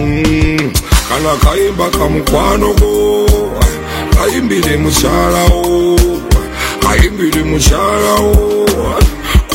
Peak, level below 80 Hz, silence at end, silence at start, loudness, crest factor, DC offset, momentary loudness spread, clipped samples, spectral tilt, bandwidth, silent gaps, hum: 0 dBFS; -14 dBFS; 0 s; 0 s; -11 LUFS; 10 dB; under 0.1%; 4 LU; 0.2%; -5 dB/octave; 17 kHz; none; none